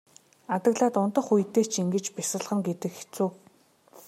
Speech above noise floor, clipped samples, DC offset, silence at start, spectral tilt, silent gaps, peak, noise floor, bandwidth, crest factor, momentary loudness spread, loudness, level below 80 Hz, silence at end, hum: 34 dB; under 0.1%; under 0.1%; 0.5 s; -5 dB/octave; none; -10 dBFS; -60 dBFS; 16 kHz; 18 dB; 8 LU; -27 LUFS; -78 dBFS; 0.1 s; none